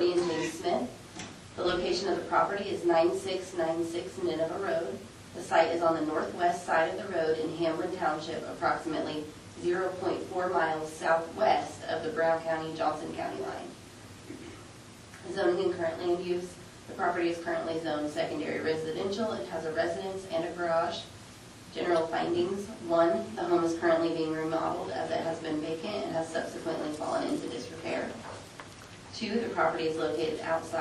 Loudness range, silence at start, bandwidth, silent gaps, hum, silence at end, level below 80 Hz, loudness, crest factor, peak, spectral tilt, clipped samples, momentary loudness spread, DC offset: 5 LU; 0 s; 12.5 kHz; none; none; 0 s; -64 dBFS; -31 LUFS; 20 dB; -12 dBFS; -5 dB/octave; under 0.1%; 16 LU; under 0.1%